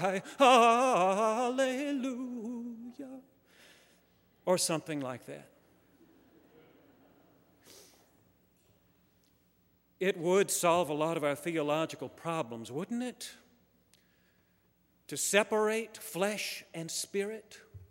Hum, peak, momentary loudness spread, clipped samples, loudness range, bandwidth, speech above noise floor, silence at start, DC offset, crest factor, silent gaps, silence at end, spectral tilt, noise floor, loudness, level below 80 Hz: none; -10 dBFS; 19 LU; under 0.1%; 9 LU; 16 kHz; 40 dB; 0 s; under 0.1%; 24 dB; none; 0.05 s; -3.5 dB/octave; -71 dBFS; -31 LUFS; -78 dBFS